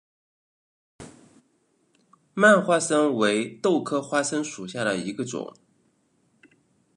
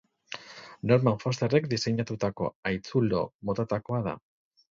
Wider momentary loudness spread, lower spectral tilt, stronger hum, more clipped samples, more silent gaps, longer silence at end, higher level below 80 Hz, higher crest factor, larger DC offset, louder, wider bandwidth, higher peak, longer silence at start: about the same, 15 LU vs 17 LU; second, -4 dB/octave vs -6.5 dB/octave; neither; neither; second, none vs 2.55-2.63 s, 3.34-3.39 s; first, 1.5 s vs 0.5 s; second, -72 dBFS vs -58 dBFS; about the same, 24 dB vs 20 dB; neither; first, -23 LUFS vs -28 LUFS; first, 11.5 kHz vs 7.6 kHz; first, -2 dBFS vs -10 dBFS; first, 1 s vs 0.3 s